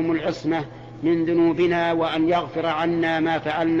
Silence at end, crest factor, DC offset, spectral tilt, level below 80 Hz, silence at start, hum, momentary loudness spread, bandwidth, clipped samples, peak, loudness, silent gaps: 0 s; 10 dB; under 0.1%; -7 dB/octave; -54 dBFS; 0 s; none; 6 LU; 7.4 kHz; under 0.1%; -10 dBFS; -22 LUFS; none